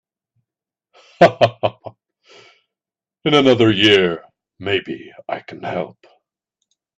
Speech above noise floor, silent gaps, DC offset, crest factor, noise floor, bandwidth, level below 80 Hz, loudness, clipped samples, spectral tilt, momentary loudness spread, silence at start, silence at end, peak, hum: 74 dB; none; under 0.1%; 20 dB; -90 dBFS; 9.6 kHz; -56 dBFS; -16 LUFS; under 0.1%; -5.5 dB/octave; 18 LU; 1.2 s; 1.05 s; 0 dBFS; none